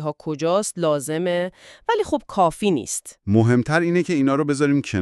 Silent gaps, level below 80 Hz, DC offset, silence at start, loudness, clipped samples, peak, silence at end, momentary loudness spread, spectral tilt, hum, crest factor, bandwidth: none; -54 dBFS; under 0.1%; 0 s; -21 LUFS; under 0.1%; -4 dBFS; 0 s; 8 LU; -5.5 dB/octave; none; 16 dB; 13.5 kHz